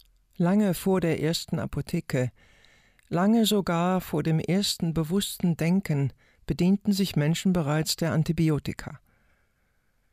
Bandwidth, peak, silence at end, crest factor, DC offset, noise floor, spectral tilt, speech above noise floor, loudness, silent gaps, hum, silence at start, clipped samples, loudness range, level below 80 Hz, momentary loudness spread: 16 kHz; -14 dBFS; 1.15 s; 12 dB; under 0.1%; -69 dBFS; -6 dB/octave; 44 dB; -26 LUFS; none; none; 0.4 s; under 0.1%; 2 LU; -52 dBFS; 8 LU